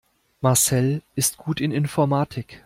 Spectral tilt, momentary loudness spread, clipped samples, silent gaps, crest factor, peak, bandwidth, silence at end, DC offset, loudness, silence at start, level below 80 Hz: -4.5 dB/octave; 7 LU; under 0.1%; none; 18 dB; -6 dBFS; 16.5 kHz; 0.1 s; under 0.1%; -22 LUFS; 0.4 s; -56 dBFS